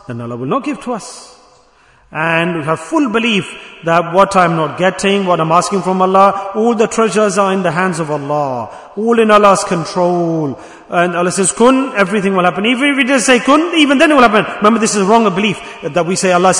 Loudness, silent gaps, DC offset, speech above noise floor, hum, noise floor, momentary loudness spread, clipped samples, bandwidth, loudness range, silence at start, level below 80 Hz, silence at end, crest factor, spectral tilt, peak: -12 LUFS; none; under 0.1%; 36 dB; none; -48 dBFS; 10 LU; 0.6%; 12 kHz; 5 LU; 0.1 s; -50 dBFS; 0 s; 12 dB; -4.5 dB/octave; 0 dBFS